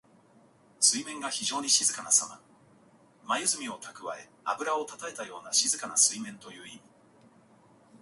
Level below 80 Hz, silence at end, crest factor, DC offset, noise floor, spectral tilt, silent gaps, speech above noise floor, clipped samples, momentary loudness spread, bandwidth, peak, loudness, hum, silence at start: -80 dBFS; 0.05 s; 24 dB; under 0.1%; -61 dBFS; 0.5 dB/octave; none; 30 dB; under 0.1%; 17 LU; 12 kHz; -8 dBFS; -27 LUFS; none; 0.8 s